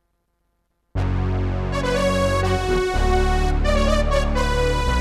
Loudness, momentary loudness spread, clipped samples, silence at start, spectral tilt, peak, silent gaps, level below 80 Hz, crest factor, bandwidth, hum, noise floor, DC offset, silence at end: -21 LUFS; 5 LU; under 0.1%; 0.95 s; -5.5 dB/octave; -6 dBFS; none; -24 dBFS; 14 dB; 13 kHz; none; -70 dBFS; under 0.1%; 0 s